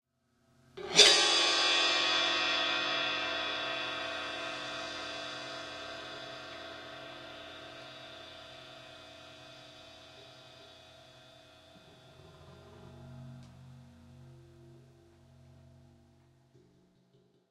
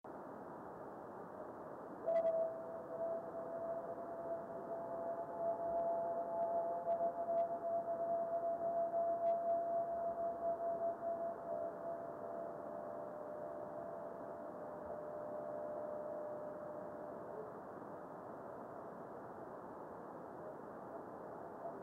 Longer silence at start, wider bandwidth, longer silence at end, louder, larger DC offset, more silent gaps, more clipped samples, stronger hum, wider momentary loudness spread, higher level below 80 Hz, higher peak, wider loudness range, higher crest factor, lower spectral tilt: first, 0.75 s vs 0.05 s; first, 16 kHz vs 3.5 kHz; first, 2.75 s vs 0 s; first, -28 LUFS vs -43 LUFS; neither; neither; neither; neither; first, 26 LU vs 13 LU; first, -72 dBFS vs -80 dBFS; first, -6 dBFS vs -28 dBFS; first, 28 LU vs 11 LU; first, 30 dB vs 14 dB; second, -0.5 dB/octave vs -8.5 dB/octave